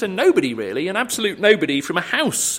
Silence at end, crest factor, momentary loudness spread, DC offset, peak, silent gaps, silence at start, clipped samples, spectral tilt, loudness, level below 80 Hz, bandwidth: 0 s; 18 dB; 6 LU; under 0.1%; -2 dBFS; none; 0 s; under 0.1%; -3 dB/octave; -19 LUFS; -64 dBFS; 16.5 kHz